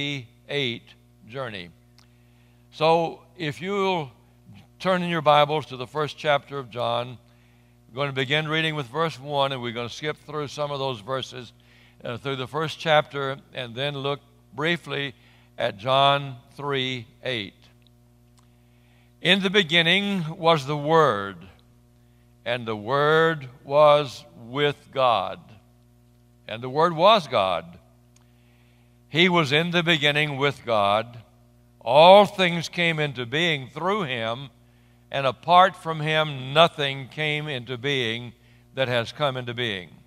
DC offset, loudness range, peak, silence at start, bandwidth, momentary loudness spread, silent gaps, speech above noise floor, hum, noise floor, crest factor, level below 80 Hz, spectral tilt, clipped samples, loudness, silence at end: under 0.1%; 8 LU; 0 dBFS; 0 s; 15 kHz; 16 LU; none; 33 dB; 60 Hz at -55 dBFS; -56 dBFS; 24 dB; -64 dBFS; -5 dB/octave; under 0.1%; -23 LUFS; 0.2 s